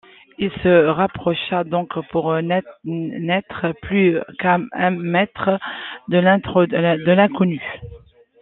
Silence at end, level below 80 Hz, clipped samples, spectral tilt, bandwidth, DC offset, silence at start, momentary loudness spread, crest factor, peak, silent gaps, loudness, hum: 0.45 s; -52 dBFS; under 0.1%; -10.5 dB/octave; 4.1 kHz; under 0.1%; 0.4 s; 11 LU; 18 dB; -2 dBFS; none; -19 LUFS; none